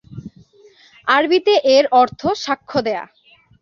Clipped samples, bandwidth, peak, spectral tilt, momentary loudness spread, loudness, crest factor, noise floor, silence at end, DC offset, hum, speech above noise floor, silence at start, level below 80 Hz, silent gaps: under 0.1%; 7.2 kHz; -2 dBFS; -4 dB/octave; 14 LU; -16 LUFS; 16 dB; -49 dBFS; 0.55 s; under 0.1%; none; 34 dB; 0.1 s; -56 dBFS; none